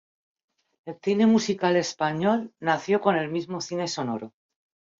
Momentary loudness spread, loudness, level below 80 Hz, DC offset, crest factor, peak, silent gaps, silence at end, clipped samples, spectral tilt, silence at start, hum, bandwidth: 12 LU; -25 LUFS; -70 dBFS; under 0.1%; 18 dB; -8 dBFS; none; 0.7 s; under 0.1%; -5 dB/octave; 0.85 s; none; 7.6 kHz